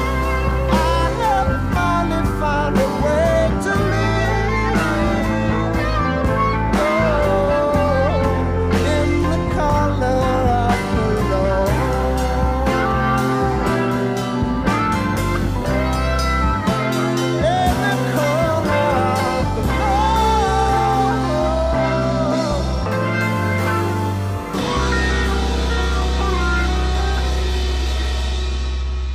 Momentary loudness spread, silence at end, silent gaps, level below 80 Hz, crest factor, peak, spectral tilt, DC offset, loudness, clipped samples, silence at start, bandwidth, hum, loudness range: 4 LU; 0 s; none; -24 dBFS; 12 dB; -6 dBFS; -6 dB/octave; under 0.1%; -18 LUFS; under 0.1%; 0 s; 15.5 kHz; none; 2 LU